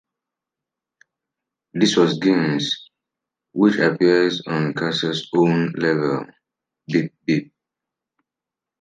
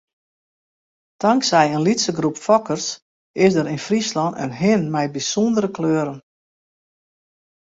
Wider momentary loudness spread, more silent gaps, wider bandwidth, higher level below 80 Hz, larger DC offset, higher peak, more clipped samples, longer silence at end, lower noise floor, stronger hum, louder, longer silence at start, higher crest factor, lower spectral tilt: about the same, 8 LU vs 8 LU; second, none vs 3.02-3.34 s; first, 9.4 kHz vs 8 kHz; second, -68 dBFS vs -62 dBFS; neither; about the same, -2 dBFS vs -2 dBFS; neither; second, 1.35 s vs 1.55 s; about the same, -87 dBFS vs under -90 dBFS; neither; about the same, -20 LUFS vs -19 LUFS; first, 1.75 s vs 1.2 s; about the same, 18 dB vs 20 dB; about the same, -5.5 dB/octave vs -4.5 dB/octave